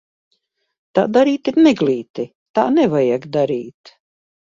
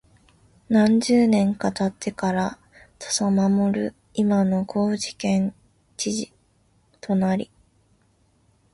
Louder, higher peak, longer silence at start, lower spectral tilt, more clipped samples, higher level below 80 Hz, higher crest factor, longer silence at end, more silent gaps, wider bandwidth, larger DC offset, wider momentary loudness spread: first, -17 LUFS vs -22 LUFS; first, 0 dBFS vs -6 dBFS; first, 0.95 s vs 0.7 s; first, -7 dB/octave vs -5.5 dB/octave; neither; about the same, -62 dBFS vs -58 dBFS; about the same, 18 dB vs 16 dB; second, 0.7 s vs 1.3 s; first, 2.10-2.14 s, 2.35-2.54 s vs none; second, 7.4 kHz vs 11.5 kHz; neither; about the same, 12 LU vs 12 LU